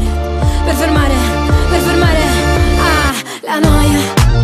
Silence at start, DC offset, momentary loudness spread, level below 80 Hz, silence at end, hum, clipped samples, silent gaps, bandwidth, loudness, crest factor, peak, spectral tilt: 0 s; under 0.1%; 4 LU; -16 dBFS; 0 s; none; under 0.1%; none; 15.5 kHz; -12 LUFS; 10 dB; 0 dBFS; -5.5 dB/octave